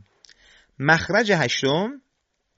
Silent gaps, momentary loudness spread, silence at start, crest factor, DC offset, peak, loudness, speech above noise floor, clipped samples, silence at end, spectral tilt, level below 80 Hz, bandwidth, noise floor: none; 7 LU; 0.8 s; 20 dB; under 0.1%; -4 dBFS; -21 LUFS; 53 dB; under 0.1%; 0.6 s; -3 dB/octave; -60 dBFS; 8 kHz; -74 dBFS